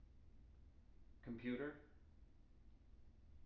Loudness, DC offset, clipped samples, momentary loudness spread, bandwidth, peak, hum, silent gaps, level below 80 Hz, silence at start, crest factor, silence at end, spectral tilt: -50 LUFS; under 0.1%; under 0.1%; 23 LU; 5.8 kHz; -34 dBFS; none; none; -66 dBFS; 0 s; 20 dB; 0 s; -6 dB/octave